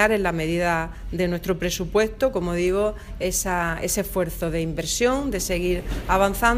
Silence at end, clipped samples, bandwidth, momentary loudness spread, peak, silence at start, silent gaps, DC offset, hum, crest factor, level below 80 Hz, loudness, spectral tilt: 0 s; under 0.1%; 16 kHz; 5 LU; -4 dBFS; 0 s; none; under 0.1%; none; 20 dB; -34 dBFS; -24 LUFS; -4 dB/octave